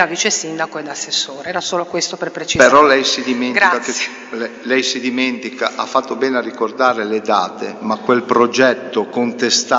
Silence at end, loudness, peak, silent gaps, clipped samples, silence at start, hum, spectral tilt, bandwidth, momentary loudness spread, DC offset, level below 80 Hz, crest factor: 0 s; -16 LUFS; 0 dBFS; none; under 0.1%; 0 s; none; -2.5 dB/octave; 8 kHz; 11 LU; under 0.1%; -54 dBFS; 16 dB